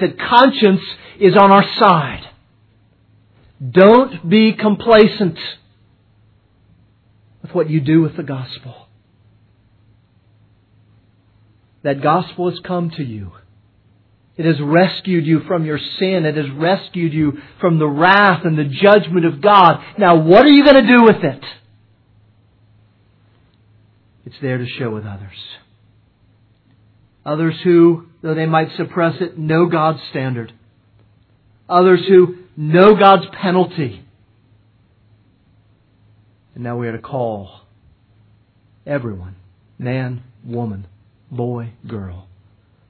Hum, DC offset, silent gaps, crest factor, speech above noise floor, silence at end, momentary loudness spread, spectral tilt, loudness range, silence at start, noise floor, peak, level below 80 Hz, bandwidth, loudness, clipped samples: none; under 0.1%; none; 16 dB; 40 dB; 0.7 s; 20 LU; -9.5 dB/octave; 17 LU; 0 s; -54 dBFS; 0 dBFS; -52 dBFS; 5.4 kHz; -14 LUFS; under 0.1%